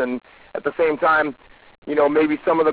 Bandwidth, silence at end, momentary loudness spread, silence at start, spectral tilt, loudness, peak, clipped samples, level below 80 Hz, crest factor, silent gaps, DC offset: 4 kHz; 0 s; 14 LU; 0 s; -9 dB/octave; -20 LUFS; -8 dBFS; under 0.1%; -58 dBFS; 14 dB; 1.78-1.82 s; under 0.1%